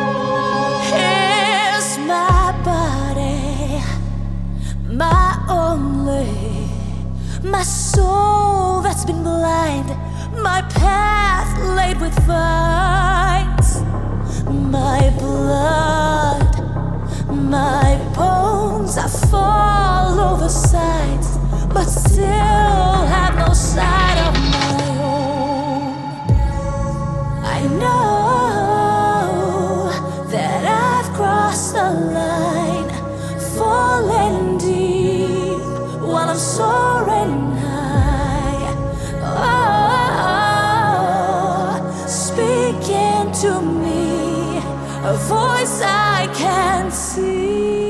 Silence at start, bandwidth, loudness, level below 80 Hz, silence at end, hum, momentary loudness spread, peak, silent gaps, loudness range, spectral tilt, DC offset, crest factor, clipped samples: 0 s; 12 kHz; -17 LUFS; -24 dBFS; 0 s; none; 8 LU; -2 dBFS; none; 3 LU; -5 dB/octave; under 0.1%; 14 dB; under 0.1%